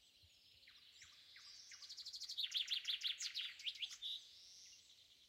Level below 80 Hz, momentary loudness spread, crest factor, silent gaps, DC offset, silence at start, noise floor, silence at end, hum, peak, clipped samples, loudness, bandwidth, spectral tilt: -90 dBFS; 22 LU; 20 dB; none; under 0.1%; 0 s; -70 dBFS; 0 s; none; -30 dBFS; under 0.1%; -44 LUFS; 16 kHz; 3.5 dB/octave